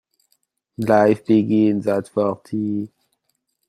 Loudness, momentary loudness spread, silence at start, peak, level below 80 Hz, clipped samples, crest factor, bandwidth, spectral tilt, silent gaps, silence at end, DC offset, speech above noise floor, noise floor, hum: -19 LUFS; 11 LU; 0.8 s; -2 dBFS; -62 dBFS; under 0.1%; 18 dB; 13 kHz; -8 dB/octave; none; 0.8 s; under 0.1%; 54 dB; -72 dBFS; none